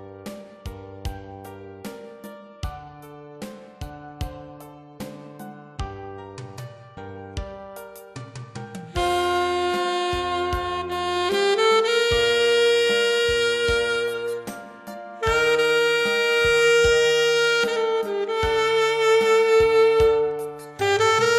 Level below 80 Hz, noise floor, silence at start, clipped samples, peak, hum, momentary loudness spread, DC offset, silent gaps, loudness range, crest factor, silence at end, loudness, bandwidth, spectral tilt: -42 dBFS; -43 dBFS; 0 s; under 0.1%; -8 dBFS; none; 22 LU; under 0.1%; none; 19 LU; 14 dB; 0 s; -20 LUFS; 14 kHz; -3.5 dB/octave